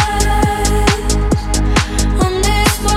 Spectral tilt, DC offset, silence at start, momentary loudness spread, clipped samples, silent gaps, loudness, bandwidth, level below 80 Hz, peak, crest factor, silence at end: -4 dB/octave; under 0.1%; 0 s; 3 LU; under 0.1%; none; -15 LUFS; 16 kHz; -16 dBFS; 0 dBFS; 14 dB; 0 s